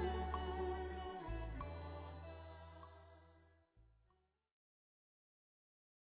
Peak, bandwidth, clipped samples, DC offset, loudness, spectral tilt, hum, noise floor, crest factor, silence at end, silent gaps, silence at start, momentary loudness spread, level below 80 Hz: -30 dBFS; 4 kHz; under 0.1%; under 0.1%; -47 LUFS; -5.5 dB/octave; none; -80 dBFS; 18 dB; 2.15 s; none; 0 s; 17 LU; -54 dBFS